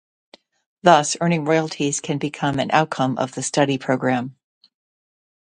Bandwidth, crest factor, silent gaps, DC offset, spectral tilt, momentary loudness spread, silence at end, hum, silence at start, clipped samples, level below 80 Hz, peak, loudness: 11.5 kHz; 22 dB; none; under 0.1%; -4.5 dB/octave; 8 LU; 1.25 s; none; 0.85 s; under 0.1%; -62 dBFS; 0 dBFS; -20 LUFS